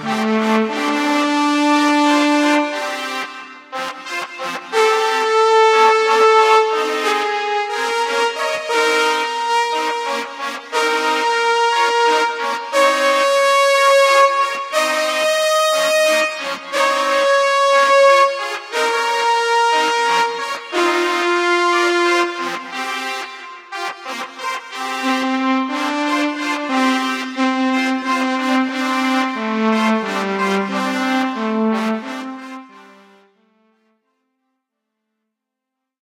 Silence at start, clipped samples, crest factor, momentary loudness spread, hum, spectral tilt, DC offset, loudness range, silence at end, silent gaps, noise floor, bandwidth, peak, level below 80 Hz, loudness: 0 s; under 0.1%; 16 dB; 12 LU; none; -2.5 dB/octave; under 0.1%; 7 LU; 3.25 s; none; -80 dBFS; 16 kHz; 0 dBFS; -82 dBFS; -16 LUFS